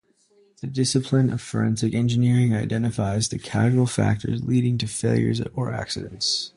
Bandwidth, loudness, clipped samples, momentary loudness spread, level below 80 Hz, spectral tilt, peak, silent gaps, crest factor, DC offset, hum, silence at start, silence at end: 11.5 kHz; -23 LUFS; under 0.1%; 7 LU; -48 dBFS; -5.5 dB/octave; -6 dBFS; none; 16 dB; under 0.1%; none; 0.65 s; 0.1 s